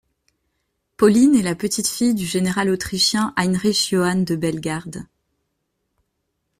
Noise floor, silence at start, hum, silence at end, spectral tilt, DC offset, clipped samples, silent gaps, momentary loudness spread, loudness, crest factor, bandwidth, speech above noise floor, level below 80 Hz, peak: -74 dBFS; 1 s; none; 1.55 s; -4.5 dB/octave; under 0.1%; under 0.1%; none; 11 LU; -19 LUFS; 18 dB; 15.5 kHz; 56 dB; -54 dBFS; -2 dBFS